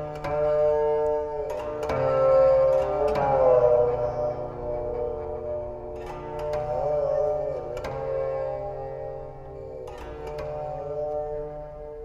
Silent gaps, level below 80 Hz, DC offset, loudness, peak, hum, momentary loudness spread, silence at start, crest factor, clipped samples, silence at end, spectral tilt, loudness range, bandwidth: none; -44 dBFS; under 0.1%; -26 LUFS; -8 dBFS; none; 17 LU; 0 s; 16 dB; under 0.1%; 0 s; -7.5 dB/octave; 11 LU; 7.6 kHz